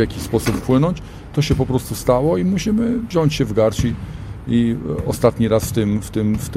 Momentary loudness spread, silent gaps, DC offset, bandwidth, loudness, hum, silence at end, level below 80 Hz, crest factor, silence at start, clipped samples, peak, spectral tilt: 6 LU; none; under 0.1%; 16 kHz; -19 LUFS; none; 0 s; -34 dBFS; 18 dB; 0 s; under 0.1%; 0 dBFS; -6.5 dB/octave